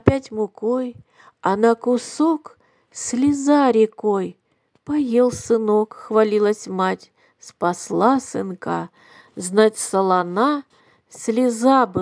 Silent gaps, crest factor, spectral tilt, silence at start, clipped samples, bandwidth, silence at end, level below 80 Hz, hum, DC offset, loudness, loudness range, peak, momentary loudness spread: none; 20 dB; -5.5 dB/octave; 0.05 s; under 0.1%; 10.5 kHz; 0 s; -52 dBFS; none; under 0.1%; -20 LUFS; 3 LU; 0 dBFS; 11 LU